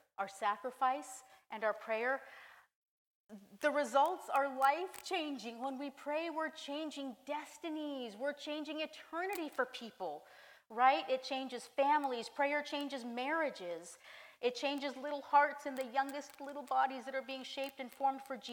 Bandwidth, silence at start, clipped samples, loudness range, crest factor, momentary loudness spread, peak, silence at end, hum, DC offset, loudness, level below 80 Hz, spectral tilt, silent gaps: 18 kHz; 0.2 s; under 0.1%; 6 LU; 22 dB; 13 LU; -16 dBFS; 0 s; none; under 0.1%; -38 LUFS; -90 dBFS; -2.5 dB/octave; 2.75-2.82 s, 2.88-3.25 s